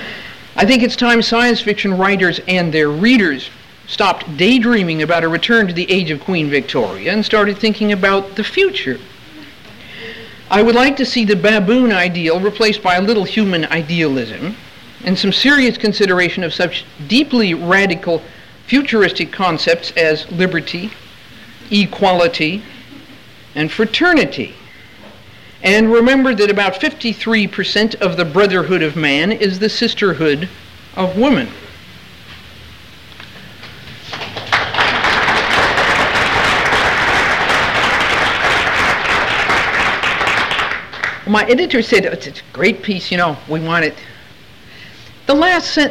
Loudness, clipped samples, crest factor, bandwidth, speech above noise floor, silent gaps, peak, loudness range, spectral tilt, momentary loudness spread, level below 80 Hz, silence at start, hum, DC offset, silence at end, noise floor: -14 LUFS; under 0.1%; 14 dB; 16 kHz; 27 dB; none; -2 dBFS; 5 LU; -5 dB/octave; 13 LU; -42 dBFS; 0 s; none; under 0.1%; 0 s; -41 dBFS